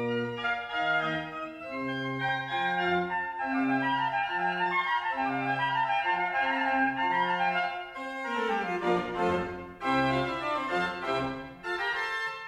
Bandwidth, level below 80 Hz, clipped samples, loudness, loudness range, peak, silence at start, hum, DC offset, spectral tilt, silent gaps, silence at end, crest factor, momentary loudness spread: 13 kHz; -62 dBFS; under 0.1%; -29 LUFS; 2 LU; -16 dBFS; 0 s; none; under 0.1%; -5.5 dB/octave; none; 0 s; 14 dB; 7 LU